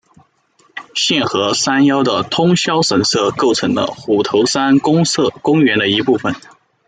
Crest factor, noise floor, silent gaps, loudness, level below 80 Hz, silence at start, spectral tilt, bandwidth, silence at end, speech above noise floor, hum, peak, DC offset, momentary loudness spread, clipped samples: 14 dB; -55 dBFS; none; -14 LUFS; -56 dBFS; 0.75 s; -4 dB/octave; 9.4 kHz; 0.5 s; 41 dB; none; -2 dBFS; under 0.1%; 5 LU; under 0.1%